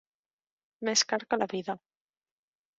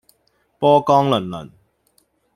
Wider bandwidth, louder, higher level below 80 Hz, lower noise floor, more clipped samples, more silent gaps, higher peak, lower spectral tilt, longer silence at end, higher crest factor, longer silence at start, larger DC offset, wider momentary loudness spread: second, 8.2 kHz vs 14 kHz; second, -29 LUFS vs -16 LUFS; second, -78 dBFS vs -58 dBFS; first, under -90 dBFS vs -64 dBFS; neither; neither; second, -12 dBFS vs -2 dBFS; second, -1.5 dB/octave vs -7 dB/octave; about the same, 1 s vs 0.9 s; about the same, 22 dB vs 18 dB; first, 0.8 s vs 0.6 s; neither; second, 12 LU vs 17 LU